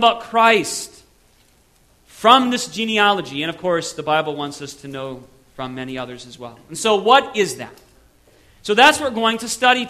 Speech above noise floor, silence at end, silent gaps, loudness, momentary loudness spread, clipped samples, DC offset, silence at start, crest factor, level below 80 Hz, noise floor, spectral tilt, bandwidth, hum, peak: 37 dB; 0 s; none; -17 LUFS; 20 LU; under 0.1%; under 0.1%; 0 s; 20 dB; -58 dBFS; -56 dBFS; -2.5 dB/octave; 14 kHz; none; 0 dBFS